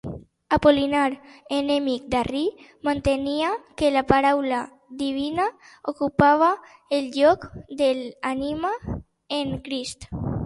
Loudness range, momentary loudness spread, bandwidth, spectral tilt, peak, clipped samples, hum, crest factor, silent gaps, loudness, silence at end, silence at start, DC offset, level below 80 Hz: 3 LU; 13 LU; 11.5 kHz; -5.5 dB/octave; 0 dBFS; under 0.1%; none; 22 dB; none; -23 LUFS; 0 s; 0.05 s; under 0.1%; -46 dBFS